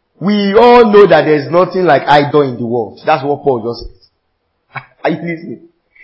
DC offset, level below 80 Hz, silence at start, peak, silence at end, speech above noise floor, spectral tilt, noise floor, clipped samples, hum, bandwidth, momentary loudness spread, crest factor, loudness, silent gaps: under 0.1%; -44 dBFS; 0.2 s; 0 dBFS; 0.5 s; 55 dB; -8 dB/octave; -65 dBFS; 0.6%; none; 8 kHz; 20 LU; 12 dB; -10 LUFS; none